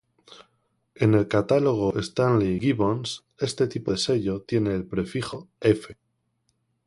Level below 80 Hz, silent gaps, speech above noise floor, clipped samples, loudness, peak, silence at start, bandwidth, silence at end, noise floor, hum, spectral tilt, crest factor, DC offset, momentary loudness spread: -52 dBFS; none; 49 dB; under 0.1%; -25 LUFS; -6 dBFS; 0.3 s; 11.5 kHz; 0.95 s; -73 dBFS; none; -6.5 dB/octave; 20 dB; under 0.1%; 9 LU